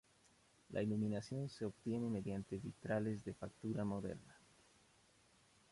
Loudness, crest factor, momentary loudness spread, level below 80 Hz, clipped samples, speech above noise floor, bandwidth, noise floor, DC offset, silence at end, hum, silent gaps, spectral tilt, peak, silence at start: -44 LUFS; 16 dB; 7 LU; -70 dBFS; under 0.1%; 29 dB; 11.5 kHz; -72 dBFS; under 0.1%; 1.35 s; none; none; -7.5 dB/octave; -28 dBFS; 0.7 s